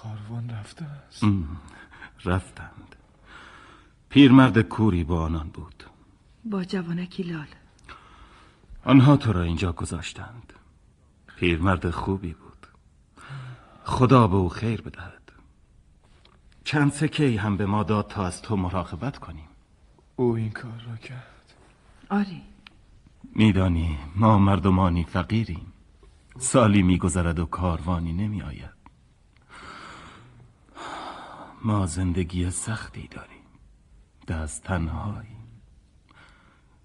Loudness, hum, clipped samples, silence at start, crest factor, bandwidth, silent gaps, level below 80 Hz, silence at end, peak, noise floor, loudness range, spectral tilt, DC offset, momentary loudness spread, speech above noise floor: -24 LUFS; none; under 0.1%; 0.05 s; 24 dB; 11.5 kHz; none; -42 dBFS; 1.4 s; -2 dBFS; -58 dBFS; 12 LU; -6.5 dB/octave; under 0.1%; 24 LU; 35 dB